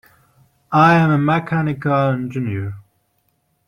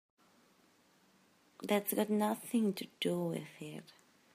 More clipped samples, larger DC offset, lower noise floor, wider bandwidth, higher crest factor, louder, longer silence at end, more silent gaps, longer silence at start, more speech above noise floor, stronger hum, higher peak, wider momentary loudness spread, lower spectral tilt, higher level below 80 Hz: neither; neither; about the same, -66 dBFS vs -69 dBFS; second, 9.2 kHz vs 15.5 kHz; about the same, 18 dB vs 20 dB; first, -17 LUFS vs -36 LUFS; first, 0.85 s vs 0.55 s; neither; second, 0.7 s vs 1.6 s; first, 49 dB vs 34 dB; neither; first, -2 dBFS vs -18 dBFS; about the same, 14 LU vs 15 LU; first, -8.5 dB/octave vs -5 dB/octave; first, -54 dBFS vs -86 dBFS